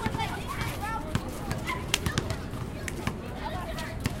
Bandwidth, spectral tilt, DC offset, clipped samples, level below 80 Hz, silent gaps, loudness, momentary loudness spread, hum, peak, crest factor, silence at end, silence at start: 17 kHz; -4.5 dB/octave; under 0.1%; under 0.1%; -40 dBFS; none; -33 LUFS; 7 LU; none; -2 dBFS; 30 dB; 0 s; 0 s